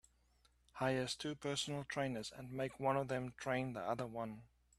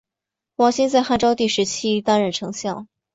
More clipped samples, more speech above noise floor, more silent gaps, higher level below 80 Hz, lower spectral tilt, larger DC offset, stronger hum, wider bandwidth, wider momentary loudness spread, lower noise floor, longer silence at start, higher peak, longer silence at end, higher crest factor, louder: neither; second, 33 dB vs 67 dB; neither; second, -70 dBFS vs -54 dBFS; about the same, -4.5 dB/octave vs -4 dB/octave; neither; neither; first, 14 kHz vs 8 kHz; about the same, 9 LU vs 11 LU; second, -74 dBFS vs -86 dBFS; first, 0.75 s vs 0.6 s; second, -22 dBFS vs -4 dBFS; about the same, 0.35 s vs 0.3 s; about the same, 20 dB vs 16 dB; second, -41 LUFS vs -20 LUFS